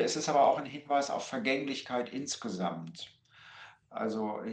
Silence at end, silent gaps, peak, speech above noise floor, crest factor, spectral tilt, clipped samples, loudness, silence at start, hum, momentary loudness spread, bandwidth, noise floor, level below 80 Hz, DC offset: 0 s; none; -14 dBFS; 22 dB; 18 dB; -4 dB/octave; under 0.1%; -32 LUFS; 0 s; none; 20 LU; 10 kHz; -54 dBFS; -78 dBFS; under 0.1%